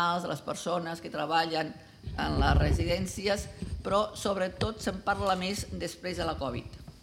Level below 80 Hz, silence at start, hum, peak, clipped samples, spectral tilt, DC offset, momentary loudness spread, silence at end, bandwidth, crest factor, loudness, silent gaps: -40 dBFS; 0 s; none; -10 dBFS; under 0.1%; -5 dB/octave; under 0.1%; 10 LU; 0.05 s; 16 kHz; 20 dB; -31 LUFS; none